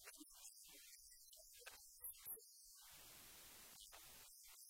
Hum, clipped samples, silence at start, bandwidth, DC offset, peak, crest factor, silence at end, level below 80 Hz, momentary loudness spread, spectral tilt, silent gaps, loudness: none; under 0.1%; 0 s; 16.5 kHz; under 0.1%; -40 dBFS; 22 dB; 0 s; -82 dBFS; 8 LU; 0 dB/octave; none; -58 LUFS